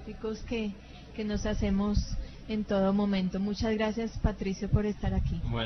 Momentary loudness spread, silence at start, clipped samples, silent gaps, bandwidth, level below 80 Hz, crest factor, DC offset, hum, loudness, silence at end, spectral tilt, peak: 10 LU; 0 s; under 0.1%; none; 6.4 kHz; -38 dBFS; 18 dB; under 0.1%; none; -31 LUFS; 0 s; -7 dB/octave; -12 dBFS